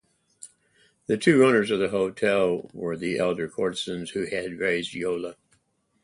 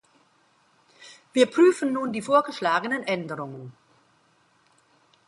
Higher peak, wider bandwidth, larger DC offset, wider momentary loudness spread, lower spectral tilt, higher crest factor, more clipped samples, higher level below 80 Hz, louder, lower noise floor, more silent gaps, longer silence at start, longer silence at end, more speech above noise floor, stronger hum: about the same, -6 dBFS vs -6 dBFS; about the same, 11.5 kHz vs 11.5 kHz; neither; second, 12 LU vs 17 LU; about the same, -5.5 dB/octave vs -5 dB/octave; about the same, 20 dB vs 20 dB; neither; first, -62 dBFS vs -76 dBFS; about the same, -25 LUFS vs -23 LUFS; first, -69 dBFS vs -63 dBFS; neither; second, 0.45 s vs 1 s; second, 0.7 s vs 1.55 s; first, 44 dB vs 40 dB; neither